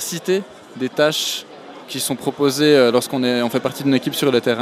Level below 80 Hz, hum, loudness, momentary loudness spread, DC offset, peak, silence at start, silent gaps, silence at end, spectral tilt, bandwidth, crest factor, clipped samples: -66 dBFS; none; -18 LUFS; 14 LU; under 0.1%; -2 dBFS; 0 s; none; 0 s; -4 dB/octave; 15.5 kHz; 18 dB; under 0.1%